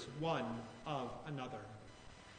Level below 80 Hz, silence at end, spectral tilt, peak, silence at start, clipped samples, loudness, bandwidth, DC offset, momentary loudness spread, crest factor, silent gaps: -66 dBFS; 0 s; -6 dB/octave; -26 dBFS; 0 s; under 0.1%; -44 LUFS; 9.4 kHz; under 0.1%; 17 LU; 20 dB; none